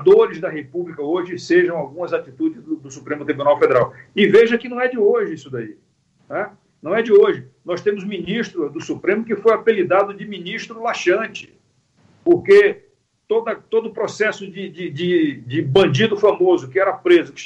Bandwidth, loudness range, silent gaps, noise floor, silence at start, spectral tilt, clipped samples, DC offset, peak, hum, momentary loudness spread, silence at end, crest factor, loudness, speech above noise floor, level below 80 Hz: 8 kHz; 3 LU; none; -58 dBFS; 0 s; -6 dB/octave; under 0.1%; under 0.1%; -2 dBFS; none; 15 LU; 0 s; 16 dB; -18 LUFS; 41 dB; -60 dBFS